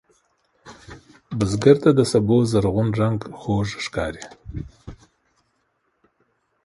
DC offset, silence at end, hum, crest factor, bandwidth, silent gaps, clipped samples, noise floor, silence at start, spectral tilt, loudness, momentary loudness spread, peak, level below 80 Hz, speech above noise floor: under 0.1%; 1.7 s; none; 22 dB; 11.5 kHz; none; under 0.1%; -70 dBFS; 0.65 s; -7 dB/octave; -20 LUFS; 20 LU; 0 dBFS; -44 dBFS; 50 dB